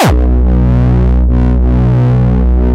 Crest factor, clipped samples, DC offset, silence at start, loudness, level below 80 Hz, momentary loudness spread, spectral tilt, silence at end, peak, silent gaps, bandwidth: 6 dB; under 0.1%; under 0.1%; 0 s; -10 LUFS; -10 dBFS; 1 LU; -8 dB/octave; 0 s; -2 dBFS; none; 9.6 kHz